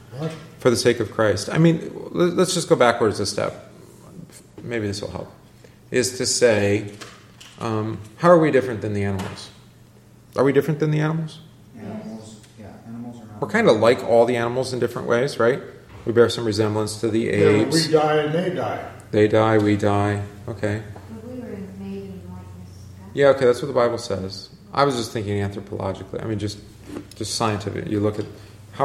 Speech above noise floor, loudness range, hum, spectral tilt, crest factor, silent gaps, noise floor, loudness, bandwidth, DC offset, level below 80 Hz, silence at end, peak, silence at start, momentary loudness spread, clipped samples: 29 dB; 7 LU; none; -5.5 dB/octave; 20 dB; none; -49 dBFS; -21 LUFS; 15 kHz; under 0.1%; -56 dBFS; 0 s; -2 dBFS; 0.1 s; 20 LU; under 0.1%